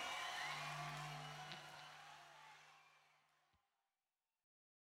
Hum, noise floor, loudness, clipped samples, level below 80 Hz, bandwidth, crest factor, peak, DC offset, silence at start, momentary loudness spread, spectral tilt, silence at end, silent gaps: none; under -90 dBFS; -49 LUFS; under 0.1%; -84 dBFS; 16 kHz; 20 dB; -34 dBFS; under 0.1%; 0 s; 17 LU; -2.5 dB/octave; 1.7 s; none